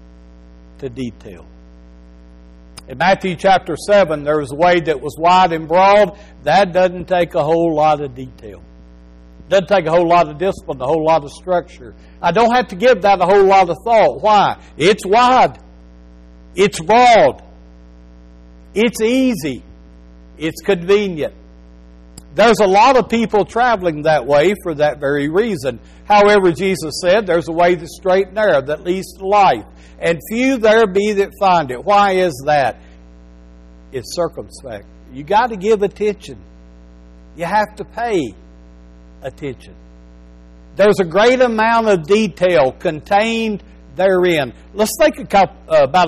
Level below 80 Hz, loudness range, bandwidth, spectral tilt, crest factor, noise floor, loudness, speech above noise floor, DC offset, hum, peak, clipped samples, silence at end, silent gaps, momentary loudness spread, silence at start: -42 dBFS; 7 LU; 14.5 kHz; -5 dB/octave; 12 dB; -41 dBFS; -14 LUFS; 26 dB; under 0.1%; 60 Hz at -40 dBFS; -2 dBFS; under 0.1%; 0 s; none; 14 LU; 0.8 s